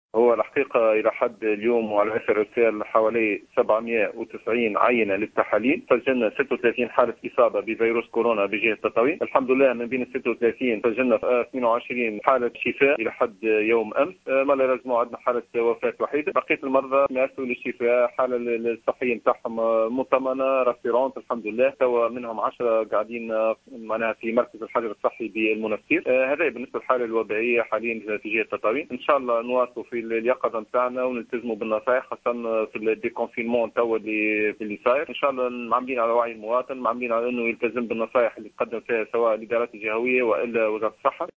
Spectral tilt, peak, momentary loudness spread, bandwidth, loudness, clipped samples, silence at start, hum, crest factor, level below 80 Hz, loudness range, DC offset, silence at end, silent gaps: -7 dB/octave; -2 dBFS; 6 LU; 7.4 kHz; -24 LUFS; under 0.1%; 0.15 s; none; 22 dB; -66 dBFS; 3 LU; under 0.1%; 0.1 s; none